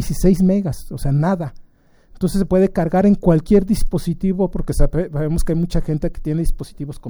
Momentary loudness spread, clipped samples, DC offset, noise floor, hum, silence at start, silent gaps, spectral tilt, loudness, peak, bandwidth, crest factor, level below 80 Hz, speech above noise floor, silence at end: 10 LU; under 0.1%; under 0.1%; -48 dBFS; none; 0 s; none; -8 dB/octave; -19 LUFS; 0 dBFS; over 20 kHz; 16 dB; -24 dBFS; 32 dB; 0 s